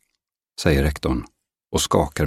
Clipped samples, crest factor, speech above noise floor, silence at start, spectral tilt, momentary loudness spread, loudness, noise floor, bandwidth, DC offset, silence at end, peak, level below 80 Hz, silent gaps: under 0.1%; 20 dB; 58 dB; 0.6 s; -5 dB/octave; 8 LU; -22 LUFS; -79 dBFS; 16.5 kHz; under 0.1%; 0 s; -2 dBFS; -32 dBFS; none